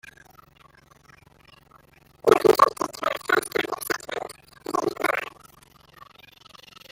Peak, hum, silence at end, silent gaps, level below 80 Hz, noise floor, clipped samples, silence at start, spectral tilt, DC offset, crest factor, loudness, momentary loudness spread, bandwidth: -2 dBFS; none; 1.65 s; none; -62 dBFS; -55 dBFS; under 0.1%; 2.25 s; -3.5 dB/octave; under 0.1%; 24 dB; -23 LUFS; 21 LU; 17 kHz